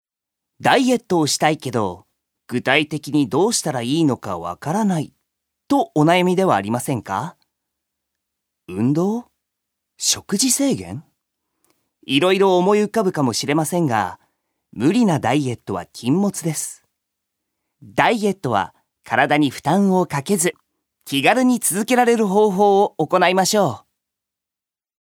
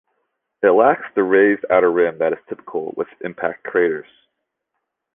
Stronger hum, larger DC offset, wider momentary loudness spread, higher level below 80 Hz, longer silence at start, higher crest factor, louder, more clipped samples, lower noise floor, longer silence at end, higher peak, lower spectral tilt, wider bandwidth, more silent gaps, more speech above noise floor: neither; neither; about the same, 11 LU vs 13 LU; about the same, -62 dBFS vs -62 dBFS; about the same, 0.6 s vs 0.6 s; about the same, 20 dB vs 18 dB; about the same, -19 LUFS vs -18 LUFS; neither; first, -89 dBFS vs -77 dBFS; about the same, 1.2 s vs 1.15 s; about the same, 0 dBFS vs -2 dBFS; second, -4.5 dB/octave vs -9 dB/octave; first, 19 kHz vs 3.7 kHz; neither; first, 71 dB vs 60 dB